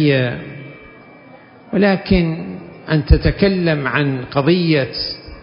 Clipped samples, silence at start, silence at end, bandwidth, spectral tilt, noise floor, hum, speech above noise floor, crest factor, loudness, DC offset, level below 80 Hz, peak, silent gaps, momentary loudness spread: under 0.1%; 0 s; 0 s; 5.4 kHz; -10.5 dB/octave; -42 dBFS; none; 27 dB; 18 dB; -17 LUFS; under 0.1%; -26 dBFS; 0 dBFS; none; 16 LU